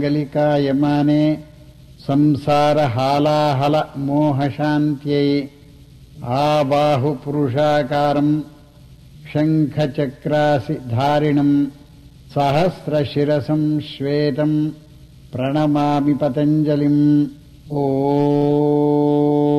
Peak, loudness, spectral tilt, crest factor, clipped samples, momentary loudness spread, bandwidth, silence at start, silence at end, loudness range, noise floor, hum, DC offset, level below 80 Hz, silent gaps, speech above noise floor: -8 dBFS; -18 LUFS; -8 dB/octave; 10 dB; under 0.1%; 7 LU; 12.5 kHz; 0 s; 0 s; 3 LU; -44 dBFS; none; under 0.1%; -50 dBFS; none; 27 dB